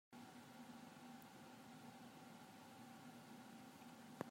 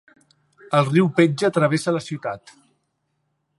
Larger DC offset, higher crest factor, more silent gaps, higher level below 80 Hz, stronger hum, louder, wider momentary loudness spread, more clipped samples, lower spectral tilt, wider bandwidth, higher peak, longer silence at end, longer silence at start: neither; first, 30 dB vs 20 dB; neither; second, under -90 dBFS vs -68 dBFS; neither; second, -60 LUFS vs -20 LUFS; second, 1 LU vs 12 LU; neither; second, -4.5 dB/octave vs -6.5 dB/octave; first, 16 kHz vs 11.5 kHz; second, -30 dBFS vs -2 dBFS; second, 0 s vs 1.2 s; second, 0.1 s vs 0.7 s